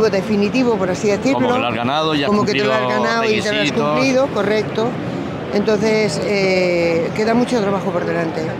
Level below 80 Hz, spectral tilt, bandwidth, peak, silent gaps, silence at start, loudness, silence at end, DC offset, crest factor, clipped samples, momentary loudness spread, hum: -50 dBFS; -5.5 dB/octave; 15 kHz; -4 dBFS; none; 0 s; -17 LUFS; 0 s; under 0.1%; 12 dB; under 0.1%; 4 LU; none